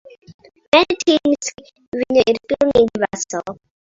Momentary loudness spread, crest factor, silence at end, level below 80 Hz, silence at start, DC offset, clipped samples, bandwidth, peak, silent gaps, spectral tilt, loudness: 13 LU; 18 dB; 0.4 s; -50 dBFS; 0.3 s; under 0.1%; under 0.1%; 7.8 kHz; 0 dBFS; 0.34-0.39 s, 0.68-0.72 s, 1.88-1.92 s; -3.5 dB/octave; -17 LUFS